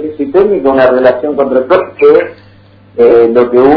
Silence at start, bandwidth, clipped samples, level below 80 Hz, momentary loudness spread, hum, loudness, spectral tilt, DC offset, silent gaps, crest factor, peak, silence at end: 0 s; 5.4 kHz; 3%; -44 dBFS; 6 LU; none; -8 LUFS; -9 dB/octave; under 0.1%; none; 8 dB; 0 dBFS; 0 s